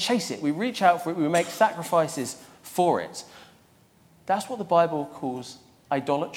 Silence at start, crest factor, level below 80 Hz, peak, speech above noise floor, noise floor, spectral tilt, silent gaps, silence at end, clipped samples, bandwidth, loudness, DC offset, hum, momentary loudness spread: 0 s; 20 dB; -72 dBFS; -6 dBFS; 33 dB; -58 dBFS; -4.5 dB/octave; none; 0 s; under 0.1%; 17 kHz; -25 LUFS; under 0.1%; none; 15 LU